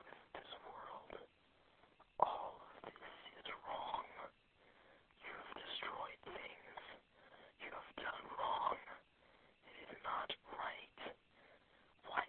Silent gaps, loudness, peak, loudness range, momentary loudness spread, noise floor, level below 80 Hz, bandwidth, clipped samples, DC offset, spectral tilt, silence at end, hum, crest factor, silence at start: none; -48 LUFS; -16 dBFS; 5 LU; 23 LU; -73 dBFS; -78 dBFS; 4.3 kHz; under 0.1%; under 0.1%; 0.5 dB/octave; 0 s; none; 34 dB; 0 s